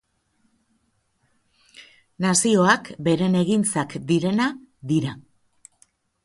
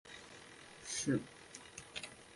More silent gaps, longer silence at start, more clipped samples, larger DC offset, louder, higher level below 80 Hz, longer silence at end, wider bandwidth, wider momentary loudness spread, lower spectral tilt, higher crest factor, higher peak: neither; first, 1.8 s vs 0.05 s; neither; neither; first, -21 LUFS vs -42 LUFS; first, -62 dBFS vs -72 dBFS; first, 1.05 s vs 0 s; about the same, 11.5 kHz vs 11.5 kHz; second, 9 LU vs 17 LU; about the same, -4.5 dB/octave vs -3.5 dB/octave; about the same, 20 dB vs 22 dB; first, -4 dBFS vs -22 dBFS